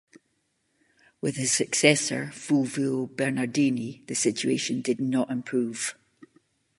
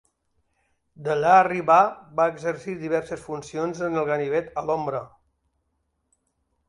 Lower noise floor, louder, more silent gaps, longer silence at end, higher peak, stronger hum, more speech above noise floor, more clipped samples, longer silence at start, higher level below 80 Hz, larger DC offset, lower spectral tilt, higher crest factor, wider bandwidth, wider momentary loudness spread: about the same, -73 dBFS vs -74 dBFS; second, -26 LUFS vs -23 LUFS; neither; second, 0.55 s vs 1.6 s; about the same, -2 dBFS vs -4 dBFS; neither; second, 47 dB vs 51 dB; neither; first, 1.25 s vs 1 s; second, -72 dBFS vs -62 dBFS; neither; second, -3.5 dB/octave vs -6 dB/octave; first, 26 dB vs 20 dB; about the same, 11.5 kHz vs 11 kHz; second, 11 LU vs 15 LU